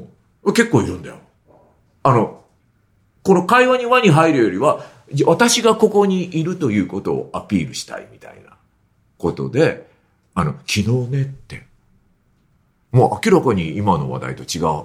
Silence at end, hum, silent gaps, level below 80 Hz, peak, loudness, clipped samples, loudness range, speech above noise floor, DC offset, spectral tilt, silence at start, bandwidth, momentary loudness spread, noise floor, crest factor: 0 s; none; none; -50 dBFS; 0 dBFS; -17 LUFS; under 0.1%; 9 LU; 43 dB; under 0.1%; -5.5 dB/octave; 0 s; 15.5 kHz; 14 LU; -60 dBFS; 18 dB